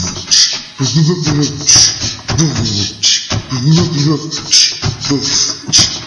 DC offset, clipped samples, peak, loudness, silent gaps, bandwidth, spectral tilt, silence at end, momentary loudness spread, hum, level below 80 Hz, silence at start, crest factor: under 0.1%; 0.3%; 0 dBFS; -11 LUFS; none; 12 kHz; -2.5 dB/octave; 0 s; 9 LU; none; -38 dBFS; 0 s; 12 dB